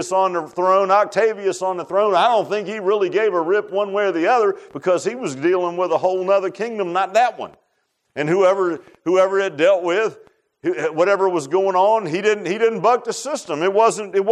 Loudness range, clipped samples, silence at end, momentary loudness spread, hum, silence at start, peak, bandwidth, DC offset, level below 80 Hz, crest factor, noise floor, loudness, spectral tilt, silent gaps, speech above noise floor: 2 LU; under 0.1%; 0 s; 9 LU; none; 0 s; -4 dBFS; 12 kHz; under 0.1%; -74 dBFS; 16 dB; -69 dBFS; -19 LUFS; -4.5 dB/octave; none; 51 dB